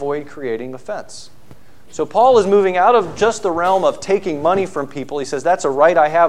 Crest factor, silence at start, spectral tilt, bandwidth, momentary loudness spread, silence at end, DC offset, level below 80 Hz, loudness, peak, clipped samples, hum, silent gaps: 16 dB; 0 s; -4.5 dB/octave; 11.5 kHz; 16 LU; 0 s; 2%; -54 dBFS; -16 LUFS; 0 dBFS; under 0.1%; none; none